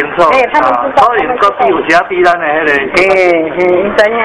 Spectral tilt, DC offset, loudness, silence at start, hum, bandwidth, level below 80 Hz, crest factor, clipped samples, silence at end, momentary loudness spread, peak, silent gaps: -5 dB/octave; under 0.1%; -9 LUFS; 0 s; none; 11 kHz; -42 dBFS; 10 dB; 2%; 0 s; 3 LU; 0 dBFS; none